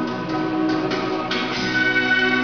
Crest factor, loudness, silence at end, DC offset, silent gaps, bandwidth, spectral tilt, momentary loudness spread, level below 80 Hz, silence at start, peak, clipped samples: 14 dB; -20 LUFS; 0 s; 0.3%; none; 7 kHz; -2 dB/octave; 6 LU; -52 dBFS; 0 s; -8 dBFS; under 0.1%